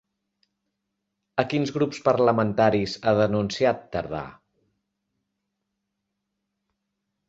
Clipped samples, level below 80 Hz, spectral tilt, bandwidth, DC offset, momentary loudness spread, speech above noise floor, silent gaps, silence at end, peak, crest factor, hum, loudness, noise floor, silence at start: under 0.1%; -56 dBFS; -6.5 dB/octave; 8 kHz; under 0.1%; 10 LU; 58 dB; none; 2.95 s; -4 dBFS; 22 dB; none; -24 LUFS; -81 dBFS; 1.35 s